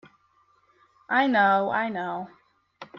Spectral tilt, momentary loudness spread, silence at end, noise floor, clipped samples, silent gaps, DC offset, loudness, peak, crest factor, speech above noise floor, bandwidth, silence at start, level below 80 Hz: -7 dB/octave; 15 LU; 0 s; -64 dBFS; under 0.1%; none; under 0.1%; -24 LUFS; -10 dBFS; 18 dB; 41 dB; 6.2 kHz; 1.1 s; -72 dBFS